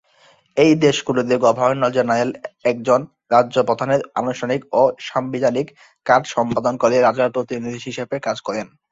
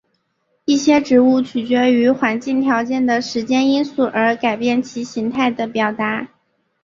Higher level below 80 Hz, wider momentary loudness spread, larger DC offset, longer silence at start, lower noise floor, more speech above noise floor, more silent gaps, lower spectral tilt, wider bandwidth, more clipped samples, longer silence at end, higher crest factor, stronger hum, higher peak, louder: about the same, -58 dBFS vs -60 dBFS; about the same, 11 LU vs 9 LU; neither; second, 0.55 s vs 0.7 s; second, -54 dBFS vs -67 dBFS; second, 36 dB vs 51 dB; neither; about the same, -5.5 dB/octave vs -4.5 dB/octave; about the same, 8 kHz vs 7.4 kHz; neither; second, 0.25 s vs 0.55 s; about the same, 18 dB vs 16 dB; neither; about the same, 0 dBFS vs -2 dBFS; about the same, -19 LUFS vs -17 LUFS